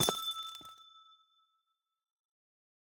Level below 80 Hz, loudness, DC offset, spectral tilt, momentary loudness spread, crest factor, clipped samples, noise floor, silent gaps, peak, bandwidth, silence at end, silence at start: -70 dBFS; -37 LUFS; under 0.1%; -1.5 dB/octave; 24 LU; 30 dB; under 0.1%; -84 dBFS; none; -12 dBFS; over 20 kHz; 1.7 s; 0 s